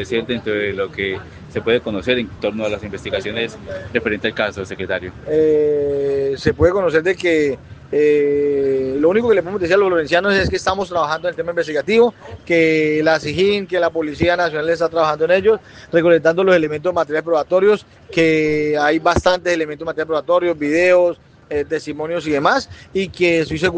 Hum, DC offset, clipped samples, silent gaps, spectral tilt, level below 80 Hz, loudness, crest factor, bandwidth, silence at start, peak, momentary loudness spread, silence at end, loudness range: none; under 0.1%; under 0.1%; none; -5.5 dB/octave; -44 dBFS; -17 LUFS; 16 dB; 9.2 kHz; 0 s; 0 dBFS; 9 LU; 0 s; 5 LU